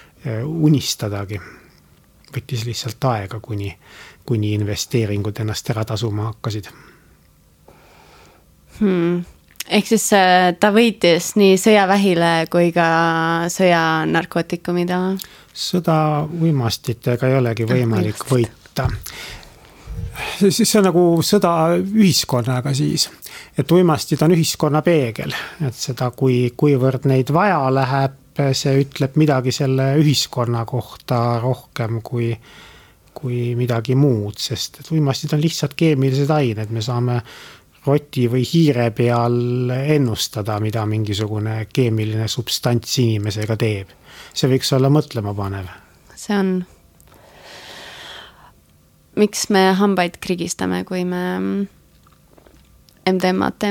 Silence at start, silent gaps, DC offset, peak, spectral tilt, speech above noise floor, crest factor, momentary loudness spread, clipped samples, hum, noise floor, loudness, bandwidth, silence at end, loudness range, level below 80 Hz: 0.25 s; none; under 0.1%; -2 dBFS; -5.5 dB/octave; 36 dB; 18 dB; 13 LU; under 0.1%; none; -53 dBFS; -18 LUFS; 18.5 kHz; 0 s; 9 LU; -48 dBFS